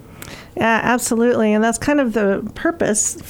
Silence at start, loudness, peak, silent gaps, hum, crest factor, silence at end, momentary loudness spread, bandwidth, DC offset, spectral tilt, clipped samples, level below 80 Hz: 0.1 s; -17 LUFS; -2 dBFS; none; none; 16 dB; 0 s; 9 LU; 17.5 kHz; under 0.1%; -4 dB/octave; under 0.1%; -46 dBFS